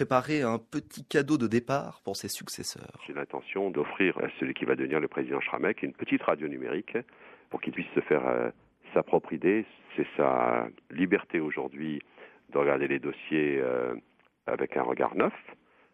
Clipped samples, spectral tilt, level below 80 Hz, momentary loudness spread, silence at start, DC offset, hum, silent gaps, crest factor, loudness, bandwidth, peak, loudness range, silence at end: under 0.1%; -5.5 dB/octave; -70 dBFS; 10 LU; 0 s; under 0.1%; none; none; 22 dB; -30 LUFS; 13.5 kHz; -8 dBFS; 3 LU; 0.4 s